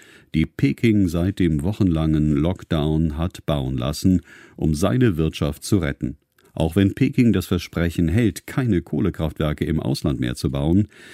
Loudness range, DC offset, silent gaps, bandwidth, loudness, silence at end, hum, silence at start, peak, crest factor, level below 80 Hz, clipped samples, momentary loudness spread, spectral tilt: 2 LU; under 0.1%; none; 16 kHz; -21 LUFS; 0 s; none; 0.35 s; -4 dBFS; 18 dB; -36 dBFS; under 0.1%; 6 LU; -7 dB/octave